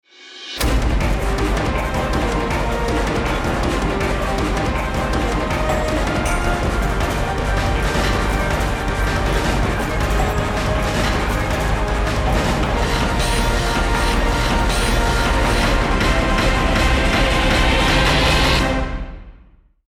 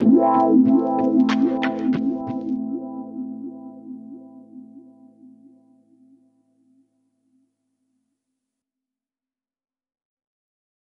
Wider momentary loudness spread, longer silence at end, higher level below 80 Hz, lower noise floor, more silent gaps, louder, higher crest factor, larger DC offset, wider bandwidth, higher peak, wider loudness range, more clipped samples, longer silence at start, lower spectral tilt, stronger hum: second, 5 LU vs 26 LU; second, 0.55 s vs 6.15 s; first, -22 dBFS vs -68 dBFS; second, -49 dBFS vs under -90 dBFS; neither; about the same, -19 LUFS vs -20 LUFS; second, 12 dB vs 18 dB; neither; first, 16.5 kHz vs 6.8 kHz; about the same, -6 dBFS vs -6 dBFS; second, 4 LU vs 24 LU; neither; first, 0.2 s vs 0 s; second, -5 dB/octave vs -8 dB/octave; neither